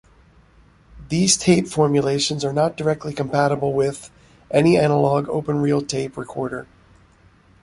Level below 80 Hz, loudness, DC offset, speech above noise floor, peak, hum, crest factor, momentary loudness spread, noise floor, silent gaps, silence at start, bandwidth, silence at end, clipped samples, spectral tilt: -50 dBFS; -20 LUFS; under 0.1%; 34 dB; -2 dBFS; none; 18 dB; 12 LU; -53 dBFS; none; 0.95 s; 11.5 kHz; 1 s; under 0.1%; -5 dB/octave